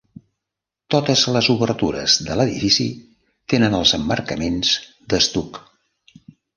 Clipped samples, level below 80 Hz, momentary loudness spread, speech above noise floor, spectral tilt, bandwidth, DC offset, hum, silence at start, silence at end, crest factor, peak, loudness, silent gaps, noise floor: under 0.1%; -44 dBFS; 9 LU; 66 dB; -4 dB/octave; 11 kHz; under 0.1%; none; 0.9 s; 1 s; 20 dB; -2 dBFS; -18 LUFS; none; -85 dBFS